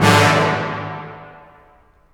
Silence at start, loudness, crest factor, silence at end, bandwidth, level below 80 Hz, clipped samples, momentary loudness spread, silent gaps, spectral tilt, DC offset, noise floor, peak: 0 s; -16 LUFS; 18 dB; 0.8 s; over 20 kHz; -48 dBFS; under 0.1%; 23 LU; none; -4.5 dB/octave; under 0.1%; -52 dBFS; 0 dBFS